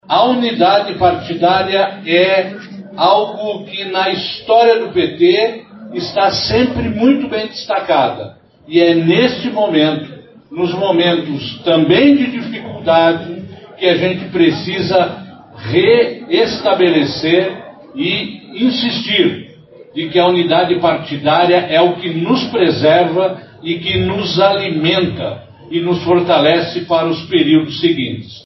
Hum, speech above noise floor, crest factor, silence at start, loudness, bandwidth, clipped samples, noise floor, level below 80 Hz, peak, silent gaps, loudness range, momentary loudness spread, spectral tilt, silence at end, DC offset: none; 26 dB; 14 dB; 0.1 s; -14 LUFS; 6.2 kHz; under 0.1%; -39 dBFS; -46 dBFS; 0 dBFS; none; 2 LU; 12 LU; -3.5 dB/octave; 0.05 s; under 0.1%